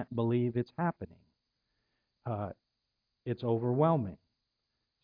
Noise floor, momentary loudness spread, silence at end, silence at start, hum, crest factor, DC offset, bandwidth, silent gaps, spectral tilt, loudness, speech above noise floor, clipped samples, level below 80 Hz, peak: -84 dBFS; 17 LU; 0.9 s; 0 s; none; 20 dB; under 0.1%; 5.2 kHz; none; -11.5 dB/octave; -33 LUFS; 52 dB; under 0.1%; -70 dBFS; -14 dBFS